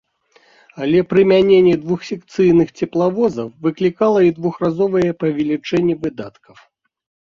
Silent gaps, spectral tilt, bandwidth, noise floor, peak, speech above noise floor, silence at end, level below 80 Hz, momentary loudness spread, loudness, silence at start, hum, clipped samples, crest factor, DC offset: none; -7.5 dB/octave; 7.2 kHz; -55 dBFS; -2 dBFS; 39 dB; 1.1 s; -54 dBFS; 11 LU; -16 LUFS; 0.75 s; none; under 0.1%; 14 dB; under 0.1%